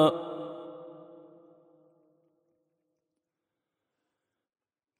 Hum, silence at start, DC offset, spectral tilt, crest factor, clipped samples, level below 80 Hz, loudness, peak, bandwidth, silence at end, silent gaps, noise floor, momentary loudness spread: none; 0 s; under 0.1%; -7 dB/octave; 26 dB; under 0.1%; -86 dBFS; -34 LUFS; -10 dBFS; 12.5 kHz; 3.8 s; none; -87 dBFS; 22 LU